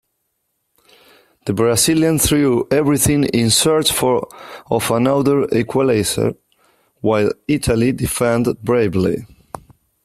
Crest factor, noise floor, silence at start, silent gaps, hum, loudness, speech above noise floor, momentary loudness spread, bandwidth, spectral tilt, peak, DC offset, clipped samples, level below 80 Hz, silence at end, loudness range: 16 dB; -70 dBFS; 1.45 s; none; none; -16 LUFS; 55 dB; 10 LU; 15.5 kHz; -4.5 dB/octave; 0 dBFS; under 0.1%; under 0.1%; -40 dBFS; 0.45 s; 4 LU